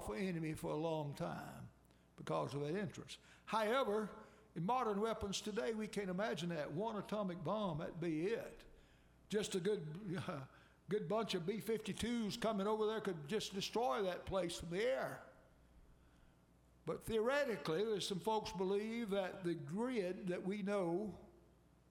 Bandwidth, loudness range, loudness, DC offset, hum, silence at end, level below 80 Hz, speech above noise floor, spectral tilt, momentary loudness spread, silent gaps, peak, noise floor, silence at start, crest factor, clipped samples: 16.5 kHz; 3 LU; -41 LUFS; under 0.1%; none; 0.55 s; -66 dBFS; 28 dB; -5.5 dB/octave; 10 LU; none; -24 dBFS; -69 dBFS; 0 s; 18 dB; under 0.1%